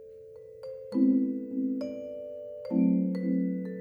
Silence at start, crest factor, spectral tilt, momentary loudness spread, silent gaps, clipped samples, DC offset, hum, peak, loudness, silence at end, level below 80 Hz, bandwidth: 0 s; 16 dB; -10.5 dB/octave; 19 LU; none; under 0.1%; under 0.1%; none; -14 dBFS; -29 LUFS; 0 s; -72 dBFS; 5.4 kHz